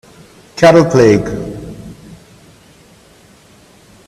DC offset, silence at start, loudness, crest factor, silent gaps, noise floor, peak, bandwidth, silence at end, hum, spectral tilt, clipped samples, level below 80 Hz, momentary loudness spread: under 0.1%; 0.55 s; -10 LUFS; 16 dB; none; -45 dBFS; 0 dBFS; 13.5 kHz; 2.15 s; none; -6.5 dB/octave; under 0.1%; -42 dBFS; 24 LU